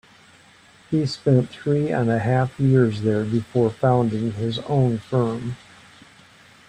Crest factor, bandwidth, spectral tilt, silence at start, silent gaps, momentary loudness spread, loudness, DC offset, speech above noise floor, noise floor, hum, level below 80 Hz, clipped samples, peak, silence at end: 16 dB; 9.2 kHz; -8 dB/octave; 0.9 s; none; 7 LU; -21 LUFS; under 0.1%; 31 dB; -51 dBFS; none; -54 dBFS; under 0.1%; -6 dBFS; 1.1 s